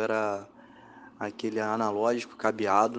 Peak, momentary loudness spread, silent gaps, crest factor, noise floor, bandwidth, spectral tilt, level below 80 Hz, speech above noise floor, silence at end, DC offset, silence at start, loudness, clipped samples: -8 dBFS; 12 LU; none; 20 dB; -51 dBFS; 9.8 kHz; -5 dB/octave; -76 dBFS; 23 dB; 0 s; under 0.1%; 0 s; -29 LUFS; under 0.1%